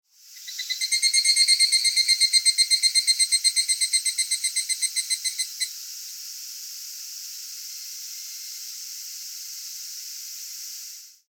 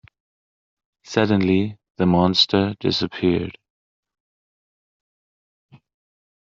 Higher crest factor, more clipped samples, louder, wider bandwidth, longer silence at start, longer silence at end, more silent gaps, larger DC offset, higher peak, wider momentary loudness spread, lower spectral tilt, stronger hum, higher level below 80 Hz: about the same, 20 dB vs 20 dB; neither; about the same, -19 LUFS vs -20 LUFS; first, 19 kHz vs 7.6 kHz; second, 0.25 s vs 1.05 s; second, 0.15 s vs 3 s; second, none vs 1.90-1.95 s; neither; second, -6 dBFS vs -2 dBFS; first, 17 LU vs 9 LU; second, 15 dB/octave vs -4.5 dB/octave; neither; second, under -90 dBFS vs -58 dBFS